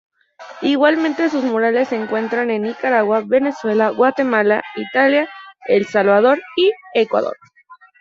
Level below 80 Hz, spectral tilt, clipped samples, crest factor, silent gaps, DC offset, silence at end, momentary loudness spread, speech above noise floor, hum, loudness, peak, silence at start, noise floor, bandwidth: -66 dBFS; -6 dB/octave; under 0.1%; 16 dB; none; under 0.1%; 0.25 s; 6 LU; 30 dB; none; -17 LUFS; -2 dBFS; 0.4 s; -46 dBFS; 7.6 kHz